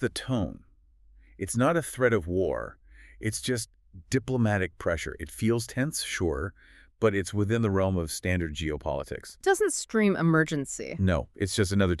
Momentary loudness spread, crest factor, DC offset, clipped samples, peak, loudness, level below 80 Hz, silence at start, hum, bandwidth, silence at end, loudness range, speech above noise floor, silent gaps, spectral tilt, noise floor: 9 LU; 20 dB; under 0.1%; under 0.1%; -8 dBFS; -28 LUFS; -46 dBFS; 0 s; none; 13.5 kHz; 0 s; 3 LU; 31 dB; none; -5.5 dB/octave; -58 dBFS